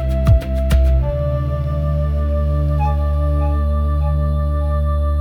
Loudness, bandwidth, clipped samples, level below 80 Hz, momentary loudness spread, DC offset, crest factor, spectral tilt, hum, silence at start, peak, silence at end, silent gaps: -18 LUFS; 5 kHz; under 0.1%; -18 dBFS; 4 LU; under 0.1%; 12 dB; -9 dB/octave; 50 Hz at -50 dBFS; 0 s; -2 dBFS; 0 s; none